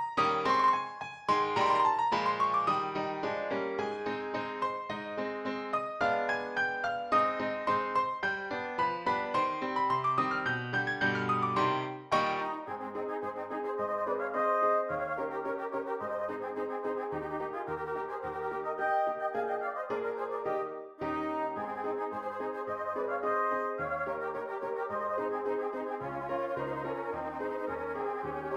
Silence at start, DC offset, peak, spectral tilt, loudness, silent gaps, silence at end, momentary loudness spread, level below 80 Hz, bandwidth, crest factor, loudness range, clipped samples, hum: 0 s; under 0.1%; -14 dBFS; -5.5 dB/octave; -32 LUFS; none; 0 s; 8 LU; -68 dBFS; 11.5 kHz; 18 dB; 5 LU; under 0.1%; none